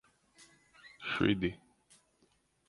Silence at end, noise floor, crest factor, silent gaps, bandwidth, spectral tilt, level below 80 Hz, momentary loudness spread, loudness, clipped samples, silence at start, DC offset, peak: 1.1 s; -73 dBFS; 24 dB; none; 11.5 kHz; -6.5 dB/octave; -60 dBFS; 25 LU; -34 LUFS; under 0.1%; 0.85 s; under 0.1%; -14 dBFS